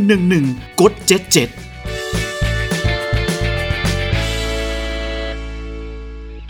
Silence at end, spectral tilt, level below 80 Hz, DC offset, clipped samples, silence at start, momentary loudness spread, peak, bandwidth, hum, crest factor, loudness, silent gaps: 0 s; -4.5 dB/octave; -26 dBFS; under 0.1%; under 0.1%; 0 s; 16 LU; 0 dBFS; over 20 kHz; none; 18 dB; -18 LUFS; none